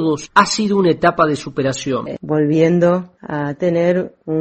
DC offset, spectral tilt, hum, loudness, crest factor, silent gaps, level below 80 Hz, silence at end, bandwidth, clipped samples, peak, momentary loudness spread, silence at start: under 0.1%; -5.5 dB/octave; none; -17 LUFS; 16 dB; none; -52 dBFS; 0 s; 8.8 kHz; under 0.1%; 0 dBFS; 9 LU; 0 s